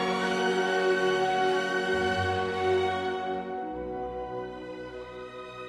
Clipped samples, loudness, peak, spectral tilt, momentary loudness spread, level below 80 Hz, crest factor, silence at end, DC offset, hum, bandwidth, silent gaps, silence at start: under 0.1%; -28 LUFS; -14 dBFS; -5 dB/octave; 14 LU; -56 dBFS; 14 dB; 0 s; under 0.1%; none; 12.5 kHz; none; 0 s